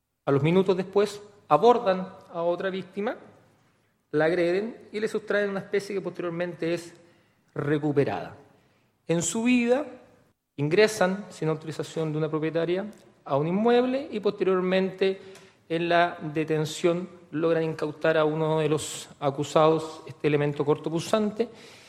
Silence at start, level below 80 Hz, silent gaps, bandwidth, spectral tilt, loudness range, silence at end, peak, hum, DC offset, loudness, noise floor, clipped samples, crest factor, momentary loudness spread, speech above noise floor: 0.25 s; -68 dBFS; none; 14 kHz; -5.5 dB/octave; 4 LU; 0.1 s; -6 dBFS; none; under 0.1%; -26 LUFS; -67 dBFS; under 0.1%; 22 dB; 11 LU; 41 dB